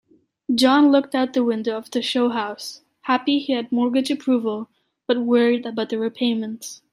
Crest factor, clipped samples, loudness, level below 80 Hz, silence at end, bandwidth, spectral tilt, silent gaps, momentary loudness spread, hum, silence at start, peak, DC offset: 16 dB; under 0.1%; -21 LUFS; -72 dBFS; 0.2 s; 14.5 kHz; -4 dB/octave; none; 16 LU; none; 0.5 s; -4 dBFS; under 0.1%